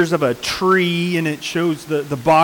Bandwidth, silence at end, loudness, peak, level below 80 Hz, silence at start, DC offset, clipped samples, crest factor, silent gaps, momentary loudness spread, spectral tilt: 19 kHz; 0 s; -18 LUFS; -6 dBFS; -52 dBFS; 0 s; under 0.1%; under 0.1%; 12 dB; none; 6 LU; -5 dB/octave